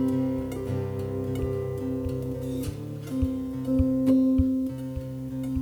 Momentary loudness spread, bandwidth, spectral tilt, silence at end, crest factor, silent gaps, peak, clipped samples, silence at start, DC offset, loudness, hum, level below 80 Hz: 12 LU; 19 kHz; -9 dB/octave; 0 s; 16 dB; none; -10 dBFS; under 0.1%; 0 s; under 0.1%; -28 LUFS; none; -40 dBFS